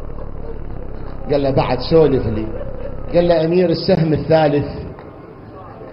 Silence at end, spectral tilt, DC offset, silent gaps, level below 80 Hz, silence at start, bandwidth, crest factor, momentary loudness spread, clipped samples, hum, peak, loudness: 0 s; -10.5 dB/octave; under 0.1%; none; -30 dBFS; 0 s; 5.8 kHz; 16 dB; 21 LU; under 0.1%; none; -2 dBFS; -16 LUFS